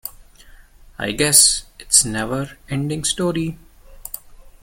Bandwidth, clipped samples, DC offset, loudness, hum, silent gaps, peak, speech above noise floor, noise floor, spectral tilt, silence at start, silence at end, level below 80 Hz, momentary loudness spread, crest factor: 17 kHz; under 0.1%; under 0.1%; -17 LUFS; none; none; 0 dBFS; 25 dB; -45 dBFS; -2 dB/octave; 0.05 s; 0.15 s; -42 dBFS; 22 LU; 22 dB